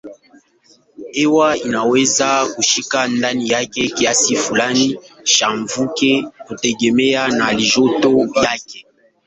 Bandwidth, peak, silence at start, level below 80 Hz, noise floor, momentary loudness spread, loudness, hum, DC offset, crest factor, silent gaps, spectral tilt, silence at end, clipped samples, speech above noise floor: 8.4 kHz; 0 dBFS; 0.05 s; -54 dBFS; -53 dBFS; 7 LU; -15 LUFS; none; under 0.1%; 16 dB; none; -2.5 dB/octave; 0.45 s; under 0.1%; 38 dB